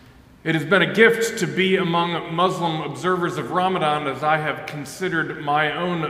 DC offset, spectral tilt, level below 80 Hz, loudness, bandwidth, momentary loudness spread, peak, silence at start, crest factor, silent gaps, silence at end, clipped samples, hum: under 0.1%; -5 dB/octave; -58 dBFS; -21 LUFS; 16 kHz; 9 LU; -2 dBFS; 0.45 s; 20 dB; none; 0 s; under 0.1%; none